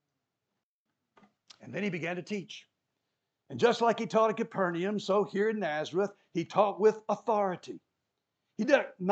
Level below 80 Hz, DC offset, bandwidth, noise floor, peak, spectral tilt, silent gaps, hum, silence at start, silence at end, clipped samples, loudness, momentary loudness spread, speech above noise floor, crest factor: -90 dBFS; under 0.1%; 8.4 kHz; -87 dBFS; -10 dBFS; -5.5 dB/octave; none; none; 1.6 s; 0 s; under 0.1%; -30 LUFS; 15 LU; 57 dB; 22 dB